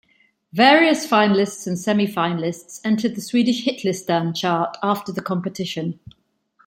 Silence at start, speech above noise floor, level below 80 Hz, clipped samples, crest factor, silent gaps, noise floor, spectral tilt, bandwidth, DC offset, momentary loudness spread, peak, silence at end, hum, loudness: 0.55 s; 41 dB; -64 dBFS; under 0.1%; 18 dB; none; -61 dBFS; -5 dB/octave; 16.5 kHz; under 0.1%; 12 LU; -2 dBFS; 0.75 s; none; -20 LUFS